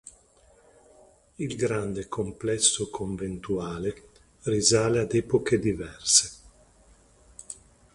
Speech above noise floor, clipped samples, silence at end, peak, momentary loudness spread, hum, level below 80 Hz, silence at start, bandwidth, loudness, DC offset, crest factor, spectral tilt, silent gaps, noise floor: 33 dB; under 0.1%; 0.4 s; -4 dBFS; 16 LU; none; -52 dBFS; 1.4 s; 11.5 kHz; -26 LUFS; under 0.1%; 24 dB; -3.5 dB/octave; none; -59 dBFS